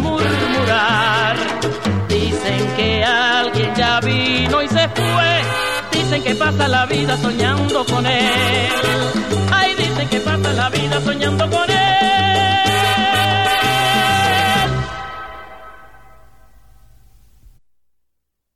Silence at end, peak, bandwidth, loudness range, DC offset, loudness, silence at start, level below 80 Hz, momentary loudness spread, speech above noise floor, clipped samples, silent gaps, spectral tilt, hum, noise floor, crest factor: 2.8 s; -2 dBFS; 16 kHz; 3 LU; 0.9%; -15 LUFS; 0 s; -40 dBFS; 5 LU; 57 dB; under 0.1%; none; -4.5 dB/octave; none; -73 dBFS; 14 dB